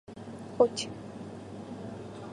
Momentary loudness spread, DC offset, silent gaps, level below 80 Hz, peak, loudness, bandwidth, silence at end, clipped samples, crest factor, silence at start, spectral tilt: 16 LU; under 0.1%; none; -64 dBFS; -10 dBFS; -34 LUFS; 11 kHz; 0 s; under 0.1%; 24 dB; 0.1 s; -5 dB/octave